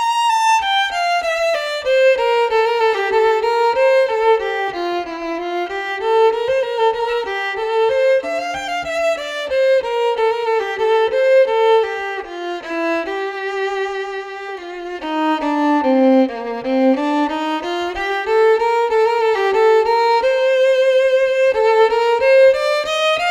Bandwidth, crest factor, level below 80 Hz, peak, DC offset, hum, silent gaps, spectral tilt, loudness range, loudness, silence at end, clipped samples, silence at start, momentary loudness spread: 14 kHz; 14 dB; -52 dBFS; -2 dBFS; under 0.1%; none; none; -2.5 dB/octave; 5 LU; -16 LUFS; 0 s; under 0.1%; 0 s; 9 LU